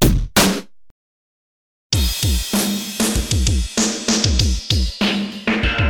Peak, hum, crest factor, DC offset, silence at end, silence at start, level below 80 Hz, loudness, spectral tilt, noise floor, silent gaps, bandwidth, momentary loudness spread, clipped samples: 0 dBFS; none; 18 dB; under 0.1%; 0 s; 0 s; -24 dBFS; -18 LUFS; -3.5 dB/octave; under -90 dBFS; 0.91-1.90 s; over 20 kHz; 5 LU; under 0.1%